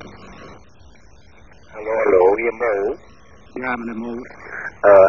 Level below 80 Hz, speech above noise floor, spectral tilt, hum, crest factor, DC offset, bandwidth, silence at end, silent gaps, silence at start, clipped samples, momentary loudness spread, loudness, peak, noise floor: -52 dBFS; 32 dB; -7 dB/octave; none; 20 dB; 0.5%; 6.6 kHz; 0 s; none; 0 s; under 0.1%; 25 LU; -19 LUFS; 0 dBFS; -48 dBFS